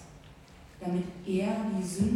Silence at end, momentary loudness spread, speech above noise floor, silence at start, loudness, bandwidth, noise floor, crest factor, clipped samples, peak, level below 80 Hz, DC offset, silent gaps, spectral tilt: 0 s; 23 LU; 22 dB; 0 s; -32 LUFS; 14.5 kHz; -52 dBFS; 18 dB; under 0.1%; -16 dBFS; -56 dBFS; under 0.1%; none; -6.5 dB/octave